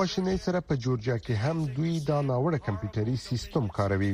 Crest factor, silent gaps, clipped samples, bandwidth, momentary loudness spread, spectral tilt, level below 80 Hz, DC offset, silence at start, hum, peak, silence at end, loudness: 16 dB; none; under 0.1%; 15 kHz; 3 LU; -7 dB/octave; -50 dBFS; under 0.1%; 0 s; none; -12 dBFS; 0 s; -29 LUFS